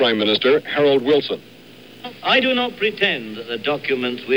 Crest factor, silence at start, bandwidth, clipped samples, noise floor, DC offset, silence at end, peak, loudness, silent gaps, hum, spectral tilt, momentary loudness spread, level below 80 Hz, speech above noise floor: 16 dB; 0 s; 16.5 kHz; under 0.1%; -43 dBFS; 0.2%; 0 s; -4 dBFS; -19 LUFS; none; none; -5.5 dB/octave; 12 LU; -64 dBFS; 24 dB